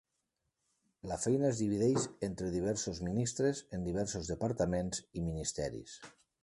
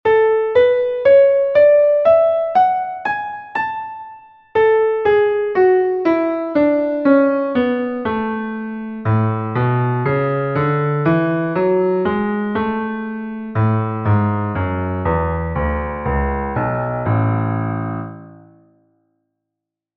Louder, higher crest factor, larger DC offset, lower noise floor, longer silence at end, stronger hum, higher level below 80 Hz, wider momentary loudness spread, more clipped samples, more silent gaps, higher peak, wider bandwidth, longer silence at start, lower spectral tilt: second, -35 LUFS vs -17 LUFS; about the same, 16 dB vs 16 dB; neither; about the same, -84 dBFS vs -82 dBFS; second, 0.35 s vs 1.6 s; neither; second, -54 dBFS vs -36 dBFS; about the same, 9 LU vs 11 LU; neither; neither; second, -20 dBFS vs -2 dBFS; first, 11.5 kHz vs 5.6 kHz; first, 1.05 s vs 0.05 s; second, -5.5 dB/octave vs -10.5 dB/octave